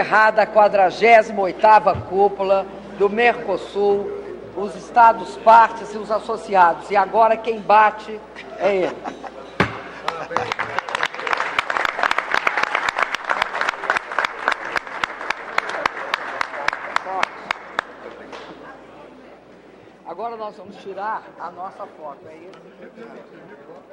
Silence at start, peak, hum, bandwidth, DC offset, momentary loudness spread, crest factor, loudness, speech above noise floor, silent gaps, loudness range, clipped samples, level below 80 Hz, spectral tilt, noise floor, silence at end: 0 s; -2 dBFS; none; 11 kHz; under 0.1%; 21 LU; 18 dB; -19 LUFS; 27 dB; none; 16 LU; under 0.1%; -56 dBFS; -4 dB/octave; -45 dBFS; 0.15 s